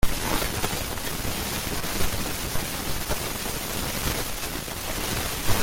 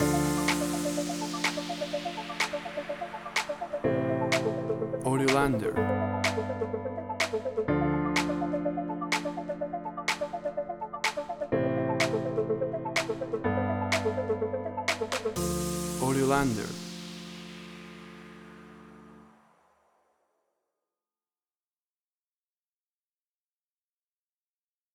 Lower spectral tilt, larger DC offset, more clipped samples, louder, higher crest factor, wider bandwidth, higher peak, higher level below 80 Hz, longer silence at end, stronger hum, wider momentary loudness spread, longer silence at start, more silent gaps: second, -3 dB/octave vs -4.5 dB/octave; neither; neither; about the same, -28 LUFS vs -30 LUFS; about the same, 20 dB vs 20 dB; second, 17 kHz vs over 20 kHz; first, -6 dBFS vs -12 dBFS; first, -34 dBFS vs -54 dBFS; second, 0 s vs 5.65 s; neither; second, 3 LU vs 13 LU; about the same, 0 s vs 0 s; neither